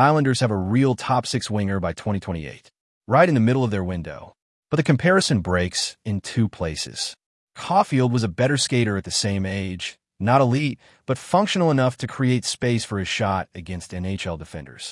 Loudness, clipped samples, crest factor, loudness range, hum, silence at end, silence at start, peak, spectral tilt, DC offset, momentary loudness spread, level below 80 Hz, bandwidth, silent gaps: -22 LUFS; under 0.1%; 18 dB; 2 LU; none; 0 s; 0 s; -4 dBFS; -5.5 dB/octave; under 0.1%; 13 LU; -52 dBFS; 12 kHz; 2.81-3.01 s, 4.42-4.63 s, 7.26-7.47 s